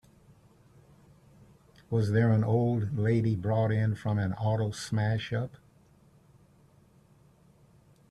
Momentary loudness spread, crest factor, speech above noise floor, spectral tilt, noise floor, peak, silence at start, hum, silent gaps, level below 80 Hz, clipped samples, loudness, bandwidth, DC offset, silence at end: 7 LU; 16 dB; 34 dB; -7.5 dB/octave; -61 dBFS; -14 dBFS; 1.9 s; none; none; -60 dBFS; under 0.1%; -29 LUFS; 11 kHz; under 0.1%; 2.6 s